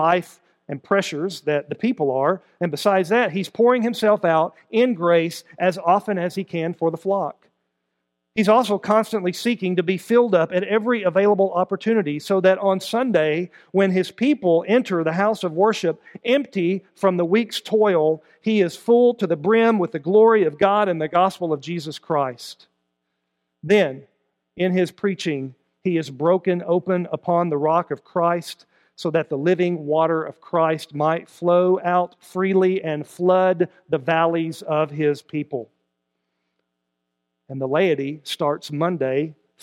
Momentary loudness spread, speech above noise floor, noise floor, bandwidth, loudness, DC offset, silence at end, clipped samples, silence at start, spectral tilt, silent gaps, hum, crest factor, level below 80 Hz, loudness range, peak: 9 LU; 58 dB; -78 dBFS; 16 kHz; -21 LUFS; under 0.1%; 0.3 s; under 0.1%; 0 s; -6.5 dB/octave; none; none; 18 dB; -72 dBFS; 6 LU; -2 dBFS